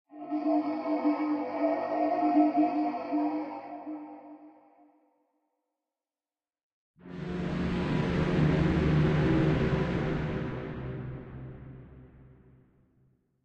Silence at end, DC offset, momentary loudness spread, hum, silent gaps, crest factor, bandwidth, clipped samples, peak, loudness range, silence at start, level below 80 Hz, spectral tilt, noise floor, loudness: 1.2 s; under 0.1%; 18 LU; none; 6.63-6.94 s; 18 dB; 7.6 kHz; under 0.1%; -14 dBFS; 15 LU; 0.1 s; -46 dBFS; -9 dB/octave; under -90 dBFS; -29 LUFS